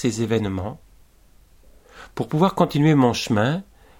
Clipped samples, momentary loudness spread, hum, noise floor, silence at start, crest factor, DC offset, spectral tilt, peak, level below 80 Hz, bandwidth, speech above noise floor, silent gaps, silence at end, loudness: under 0.1%; 14 LU; none; -53 dBFS; 0 s; 18 dB; under 0.1%; -6.5 dB/octave; -4 dBFS; -50 dBFS; 16.5 kHz; 33 dB; none; 0.35 s; -21 LUFS